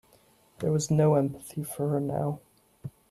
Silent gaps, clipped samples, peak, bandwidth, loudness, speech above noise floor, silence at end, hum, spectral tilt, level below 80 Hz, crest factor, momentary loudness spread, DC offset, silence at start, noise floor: none; under 0.1%; -12 dBFS; 13.5 kHz; -28 LUFS; 35 dB; 0.2 s; none; -7 dB/octave; -62 dBFS; 16 dB; 21 LU; under 0.1%; 0.6 s; -62 dBFS